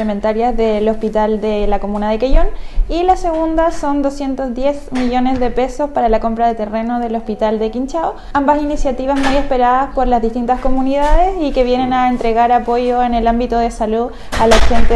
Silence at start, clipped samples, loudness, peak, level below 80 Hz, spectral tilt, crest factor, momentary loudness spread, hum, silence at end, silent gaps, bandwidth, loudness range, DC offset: 0 s; under 0.1%; -16 LUFS; 0 dBFS; -20 dBFS; -5.5 dB/octave; 12 dB; 6 LU; none; 0 s; none; 11 kHz; 3 LU; under 0.1%